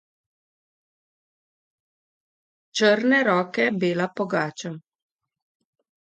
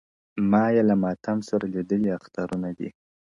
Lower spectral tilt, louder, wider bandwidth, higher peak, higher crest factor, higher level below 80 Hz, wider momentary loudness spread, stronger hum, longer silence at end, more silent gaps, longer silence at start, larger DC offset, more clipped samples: second, -5 dB/octave vs -8.5 dB/octave; first, -22 LUFS vs -25 LUFS; first, 9 kHz vs 7.6 kHz; about the same, -6 dBFS vs -8 dBFS; about the same, 20 dB vs 16 dB; second, -74 dBFS vs -60 dBFS; about the same, 15 LU vs 13 LU; neither; first, 1.25 s vs 0.45 s; neither; first, 2.75 s vs 0.35 s; neither; neither